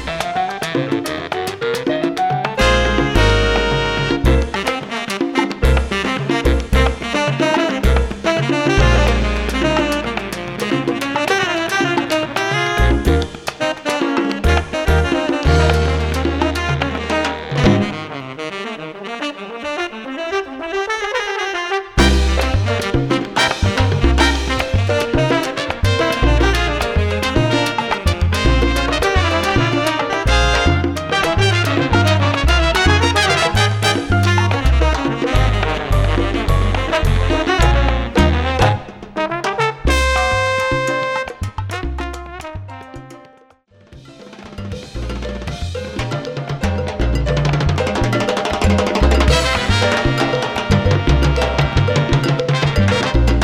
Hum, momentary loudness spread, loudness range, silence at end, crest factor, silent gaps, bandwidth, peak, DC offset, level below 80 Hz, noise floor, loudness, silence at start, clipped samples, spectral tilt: none; 10 LU; 7 LU; 0 s; 16 dB; none; 15 kHz; 0 dBFS; under 0.1%; -22 dBFS; -49 dBFS; -17 LUFS; 0 s; under 0.1%; -5.5 dB/octave